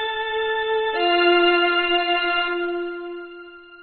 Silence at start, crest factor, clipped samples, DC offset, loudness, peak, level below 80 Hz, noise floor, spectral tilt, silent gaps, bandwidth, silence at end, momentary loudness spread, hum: 0 s; 16 dB; under 0.1%; under 0.1%; -20 LUFS; -6 dBFS; -56 dBFS; -41 dBFS; 1.5 dB/octave; none; 4.5 kHz; 0 s; 18 LU; none